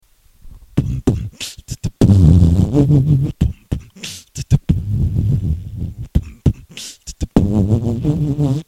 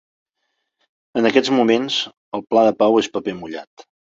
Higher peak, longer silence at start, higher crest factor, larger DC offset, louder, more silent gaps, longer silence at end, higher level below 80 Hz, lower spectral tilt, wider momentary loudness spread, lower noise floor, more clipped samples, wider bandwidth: about the same, 0 dBFS vs -2 dBFS; second, 0.45 s vs 1.15 s; about the same, 16 dB vs 18 dB; neither; about the same, -17 LUFS vs -18 LUFS; second, none vs 2.17-2.32 s; second, 0.05 s vs 0.5 s; first, -26 dBFS vs -62 dBFS; first, -7.5 dB/octave vs -4.5 dB/octave; about the same, 16 LU vs 15 LU; second, -41 dBFS vs -74 dBFS; neither; first, 14 kHz vs 7.8 kHz